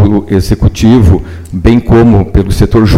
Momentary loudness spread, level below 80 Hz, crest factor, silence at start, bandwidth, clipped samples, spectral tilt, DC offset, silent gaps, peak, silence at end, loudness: 6 LU; -16 dBFS; 6 dB; 0 s; 15 kHz; 2%; -7.5 dB/octave; under 0.1%; none; 0 dBFS; 0 s; -8 LUFS